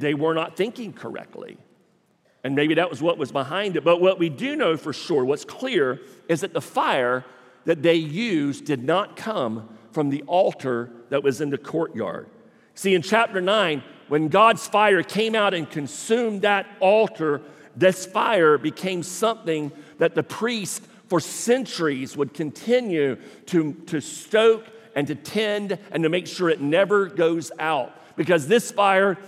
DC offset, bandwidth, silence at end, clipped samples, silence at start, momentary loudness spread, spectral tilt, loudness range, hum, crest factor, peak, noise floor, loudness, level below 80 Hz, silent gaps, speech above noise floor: under 0.1%; 15.5 kHz; 0 s; under 0.1%; 0 s; 11 LU; -4.5 dB/octave; 4 LU; none; 20 dB; -4 dBFS; -63 dBFS; -22 LUFS; -78 dBFS; none; 41 dB